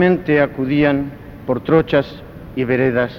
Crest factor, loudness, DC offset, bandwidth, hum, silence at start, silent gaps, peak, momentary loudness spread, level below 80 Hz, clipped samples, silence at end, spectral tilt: 16 dB; -17 LUFS; under 0.1%; 15 kHz; none; 0 s; none; 0 dBFS; 14 LU; -42 dBFS; under 0.1%; 0 s; -9 dB/octave